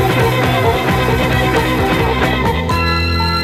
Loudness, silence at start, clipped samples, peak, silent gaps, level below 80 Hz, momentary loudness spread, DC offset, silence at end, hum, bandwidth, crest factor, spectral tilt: -14 LUFS; 0 s; under 0.1%; -2 dBFS; none; -24 dBFS; 2 LU; under 0.1%; 0 s; none; 16 kHz; 12 dB; -5.5 dB/octave